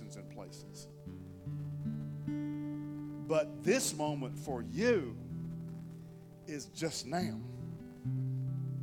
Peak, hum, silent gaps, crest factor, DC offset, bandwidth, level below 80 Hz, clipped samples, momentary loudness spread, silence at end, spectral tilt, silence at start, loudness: -16 dBFS; none; none; 20 dB; under 0.1%; 17.5 kHz; -66 dBFS; under 0.1%; 17 LU; 0 s; -5.5 dB/octave; 0 s; -38 LUFS